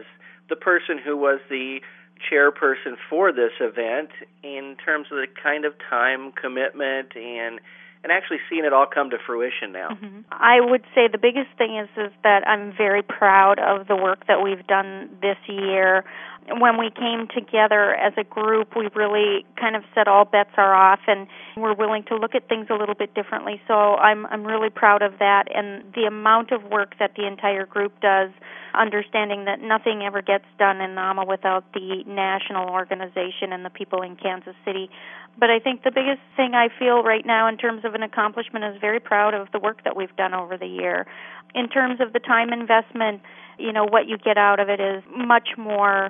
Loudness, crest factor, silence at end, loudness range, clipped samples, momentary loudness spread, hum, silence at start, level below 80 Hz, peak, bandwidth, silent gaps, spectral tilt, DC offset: -21 LUFS; 20 dB; 0 s; 6 LU; under 0.1%; 13 LU; none; 0 s; -86 dBFS; 0 dBFS; 3.8 kHz; none; -8 dB/octave; under 0.1%